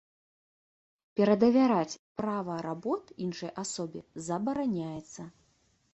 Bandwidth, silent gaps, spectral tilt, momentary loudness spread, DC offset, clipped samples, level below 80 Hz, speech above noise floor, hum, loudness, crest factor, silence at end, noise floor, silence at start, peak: 8.6 kHz; 1.99-2.15 s; -6 dB/octave; 17 LU; under 0.1%; under 0.1%; -70 dBFS; 40 dB; none; -30 LUFS; 20 dB; 0.65 s; -70 dBFS; 1.15 s; -12 dBFS